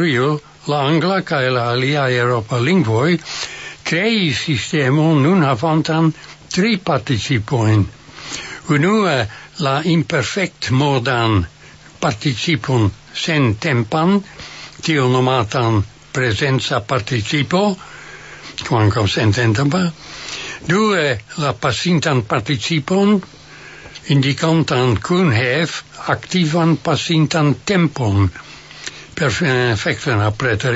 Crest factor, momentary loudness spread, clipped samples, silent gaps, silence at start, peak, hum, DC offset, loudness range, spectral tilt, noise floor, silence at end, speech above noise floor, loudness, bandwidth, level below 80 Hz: 16 dB; 12 LU; under 0.1%; none; 0 s; -2 dBFS; none; under 0.1%; 2 LU; -5.5 dB/octave; -42 dBFS; 0 s; 26 dB; -17 LUFS; 8 kHz; -46 dBFS